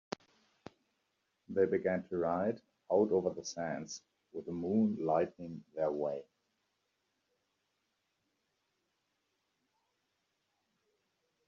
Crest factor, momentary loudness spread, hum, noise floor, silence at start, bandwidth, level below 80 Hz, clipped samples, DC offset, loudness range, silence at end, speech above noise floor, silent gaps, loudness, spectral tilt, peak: 22 dB; 15 LU; none; -83 dBFS; 1.5 s; 7.4 kHz; -80 dBFS; under 0.1%; under 0.1%; 9 LU; 5.25 s; 48 dB; none; -35 LUFS; -6 dB/octave; -18 dBFS